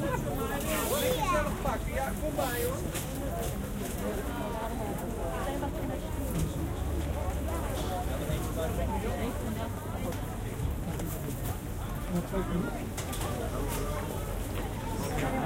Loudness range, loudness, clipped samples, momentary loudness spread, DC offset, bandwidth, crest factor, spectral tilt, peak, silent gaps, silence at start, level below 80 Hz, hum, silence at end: 4 LU; -33 LUFS; under 0.1%; 5 LU; under 0.1%; 17 kHz; 16 dB; -5.5 dB/octave; -16 dBFS; none; 0 s; -38 dBFS; none; 0 s